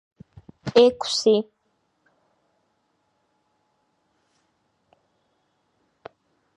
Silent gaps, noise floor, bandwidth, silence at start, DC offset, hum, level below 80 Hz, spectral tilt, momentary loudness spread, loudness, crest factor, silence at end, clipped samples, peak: none; -71 dBFS; 11 kHz; 0.65 s; under 0.1%; none; -66 dBFS; -4 dB/octave; 18 LU; -20 LUFS; 24 dB; 5.15 s; under 0.1%; -2 dBFS